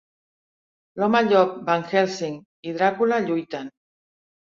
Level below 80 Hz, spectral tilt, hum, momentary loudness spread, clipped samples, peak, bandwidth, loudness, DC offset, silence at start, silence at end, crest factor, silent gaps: -70 dBFS; -5.5 dB/octave; none; 16 LU; under 0.1%; -6 dBFS; 7.6 kHz; -22 LUFS; under 0.1%; 0.95 s; 0.9 s; 18 dB; 2.45-2.63 s